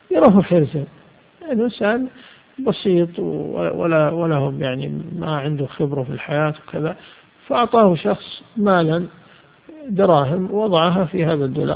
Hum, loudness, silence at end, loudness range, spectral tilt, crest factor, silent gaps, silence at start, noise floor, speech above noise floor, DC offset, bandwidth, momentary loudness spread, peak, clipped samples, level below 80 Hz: none; -19 LUFS; 0 s; 4 LU; -11 dB/octave; 18 dB; none; 0.1 s; -46 dBFS; 28 dB; under 0.1%; 5 kHz; 12 LU; 0 dBFS; under 0.1%; -54 dBFS